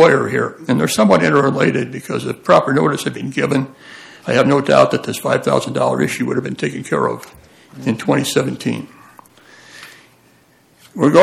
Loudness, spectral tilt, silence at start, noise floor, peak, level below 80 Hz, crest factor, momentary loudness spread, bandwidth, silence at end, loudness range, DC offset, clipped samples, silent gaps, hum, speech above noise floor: -16 LUFS; -5.5 dB/octave; 0 s; -52 dBFS; 0 dBFS; -56 dBFS; 16 dB; 17 LU; 15 kHz; 0 s; 7 LU; under 0.1%; under 0.1%; none; none; 37 dB